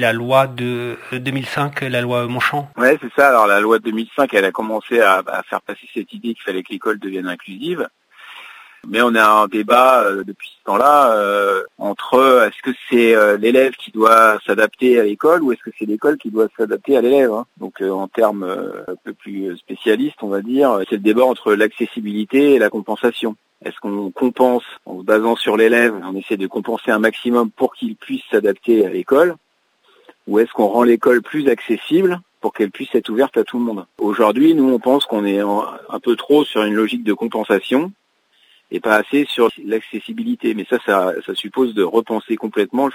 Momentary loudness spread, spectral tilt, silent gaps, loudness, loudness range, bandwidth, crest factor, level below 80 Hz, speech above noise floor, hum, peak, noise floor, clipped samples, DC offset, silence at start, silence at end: 13 LU; -5.5 dB/octave; none; -16 LUFS; 6 LU; 16 kHz; 16 dB; -68 dBFS; 42 dB; none; 0 dBFS; -59 dBFS; under 0.1%; under 0.1%; 0 s; 0 s